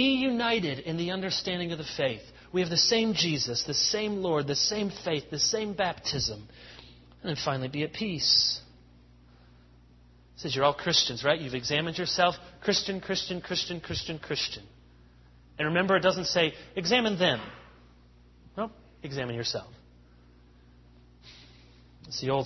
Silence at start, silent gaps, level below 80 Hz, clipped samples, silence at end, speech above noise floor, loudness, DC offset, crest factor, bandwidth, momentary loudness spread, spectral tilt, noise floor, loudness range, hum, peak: 0 s; none; -58 dBFS; under 0.1%; 0 s; 28 dB; -28 LUFS; under 0.1%; 22 dB; 6.4 kHz; 13 LU; -3.5 dB/octave; -56 dBFS; 11 LU; 60 Hz at -55 dBFS; -8 dBFS